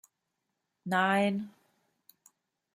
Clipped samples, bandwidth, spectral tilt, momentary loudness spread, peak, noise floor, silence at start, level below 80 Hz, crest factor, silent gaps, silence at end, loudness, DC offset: under 0.1%; 15.5 kHz; -6 dB/octave; 20 LU; -12 dBFS; -84 dBFS; 0.85 s; -80 dBFS; 22 dB; none; 1.25 s; -29 LUFS; under 0.1%